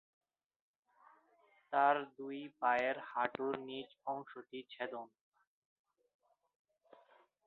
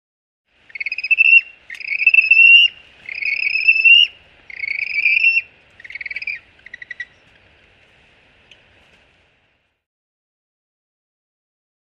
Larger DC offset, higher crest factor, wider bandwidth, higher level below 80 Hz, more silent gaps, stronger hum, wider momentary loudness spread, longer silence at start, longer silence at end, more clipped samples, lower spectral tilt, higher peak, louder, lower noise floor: neither; first, 24 dB vs 18 dB; second, 4.6 kHz vs 6.4 kHz; second, -86 dBFS vs -64 dBFS; neither; neither; second, 17 LU vs 24 LU; first, 1.7 s vs 0.8 s; second, 2.4 s vs 4.75 s; neither; first, -1.5 dB/octave vs 1 dB/octave; second, -18 dBFS vs -2 dBFS; second, -38 LUFS vs -11 LUFS; first, -72 dBFS vs -64 dBFS